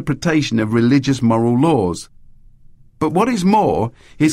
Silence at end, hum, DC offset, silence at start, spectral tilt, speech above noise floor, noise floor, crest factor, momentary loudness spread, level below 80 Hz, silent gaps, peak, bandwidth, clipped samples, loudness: 0 s; none; under 0.1%; 0 s; -6.5 dB/octave; 29 dB; -44 dBFS; 14 dB; 8 LU; -44 dBFS; none; -2 dBFS; 13.5 kHz; under 0.1%; -16 LUFS